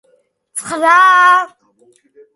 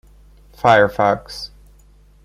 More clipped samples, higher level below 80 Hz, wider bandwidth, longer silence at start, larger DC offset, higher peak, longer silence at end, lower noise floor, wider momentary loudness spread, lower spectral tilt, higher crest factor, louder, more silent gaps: neither; second, -68 dBFS vs -46 dBFS; second, 11.5 kHz vs 15 kHz; about the same, 0.55 s vs 0.65 s; neither; about the same, 0 dBFS vs 0 dBFS; about the same, 0.9 s vs 0.8 s; first, -57 dBFS vs -49 dBFS; about the same, 19 LU vs 18 LU; second, -1 dB/octave vs -5.5 dB/octave; about the same, 14 dB vs 18 dB; first, -10 LUFS vs -16 LUFS; neither